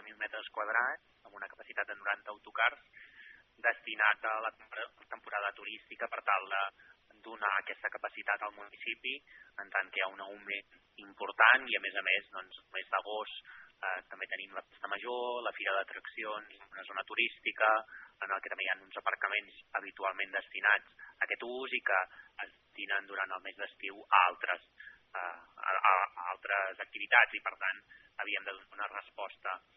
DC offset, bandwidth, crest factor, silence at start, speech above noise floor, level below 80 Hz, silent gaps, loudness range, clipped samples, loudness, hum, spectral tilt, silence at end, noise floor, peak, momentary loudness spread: under 0.1%; 5.6 kHz; 28 dB; 0 s; 22 dB; -82 dBFS; none; 6 LU; under 0.1%; -34 LUFS; none; 3.5 dB/octave; 0.2 s; -58 dBFS; -8 dBFS; 17 LU